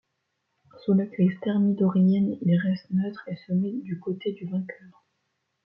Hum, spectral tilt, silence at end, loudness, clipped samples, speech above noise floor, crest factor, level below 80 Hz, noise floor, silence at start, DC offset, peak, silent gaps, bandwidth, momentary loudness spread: none; -11.5 dB/octave; 0.75 s; -26 LUFS; under 0.1%; 53 dB; 14 dB; -70 dBFS; -78 dBFS; 0.75 s; under 0.1%; -12 dBFS; none; 5.6 kHz; 11 LU